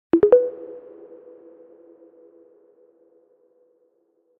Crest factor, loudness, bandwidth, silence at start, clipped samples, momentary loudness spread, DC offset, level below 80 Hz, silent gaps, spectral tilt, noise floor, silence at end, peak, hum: 22 dB; -18 LUFS; 3.4 kHz; 0.15 s; under 0.1%; 29 LU; under 0.1%; -62 dBFS; none; -10 dB/octave; -66 dBFS; 3.6 s; -4 dBFS; none